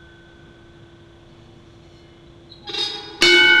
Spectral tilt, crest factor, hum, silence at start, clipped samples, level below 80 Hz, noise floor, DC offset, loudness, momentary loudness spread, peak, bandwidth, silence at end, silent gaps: -1.5 dB/octave; 18 dB; none; 2.65 s; under 0.1%; -54 dBFS; -46 dBFS; under 0.1%; -15 LUFS; 19 LU; -2 dBFS; 13.5 kHz; 0 s; none